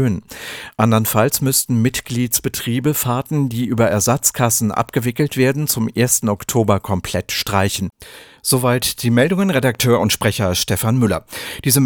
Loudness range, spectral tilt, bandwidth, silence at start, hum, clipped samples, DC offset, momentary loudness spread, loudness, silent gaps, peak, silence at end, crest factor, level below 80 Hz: 2 LU; -4.5 dB/octave; over 20 kHz; 0 s; none; under 0.1%; under 0.1%; 6 LU; -17 LUFS; none; 0 dBFS; 0 s; 18 dB; -46 dBFS